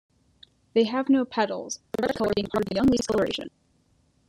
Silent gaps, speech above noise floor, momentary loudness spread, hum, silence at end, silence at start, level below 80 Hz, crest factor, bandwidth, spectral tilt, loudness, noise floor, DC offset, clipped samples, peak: none; 41 dB; 10 LU; none; 0.8 s; 0.75 s; -54 dBFS; 18 dB; 13 kHz; -5 dB/octave; -25 LUFS; -65 dBFS; under 0.1%; under 0.1%; -10 dBFS